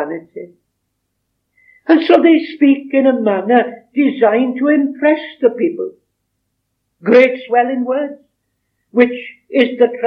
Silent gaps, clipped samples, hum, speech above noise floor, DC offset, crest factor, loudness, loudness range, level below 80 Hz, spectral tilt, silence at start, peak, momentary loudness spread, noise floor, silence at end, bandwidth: none; under 0.1%; none; 57 dB; under 0.1%; 14 dB; -14 LUFS; 3 LU; -74 dBFS; -7 dB/octave; 0 s; 0 dBFS; 15 LU; -71 dBFS; 0 s; 5.8 kHz